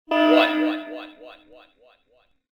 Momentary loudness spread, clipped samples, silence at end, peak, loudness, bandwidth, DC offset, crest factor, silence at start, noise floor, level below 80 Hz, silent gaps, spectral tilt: 21 LU; under 0.1%; 1.2 s; -4 dBFS; -20 LUFS; 6.8 kHz; under 0.1%; 20 dB; 0.1 s; -63 dBFS; -72 dBFS; none; -3.5 dB/octave